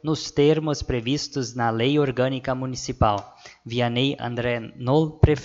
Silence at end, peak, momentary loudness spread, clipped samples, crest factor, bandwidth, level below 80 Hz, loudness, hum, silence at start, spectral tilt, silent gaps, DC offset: 0 s; 0 dBFS; 8 LU; under 0.1%; 22 dB; 7.8 kHz; -38 dBFS; -23 LUFS; none; 0.05 s; -6 dB/octave; none; under 0.1%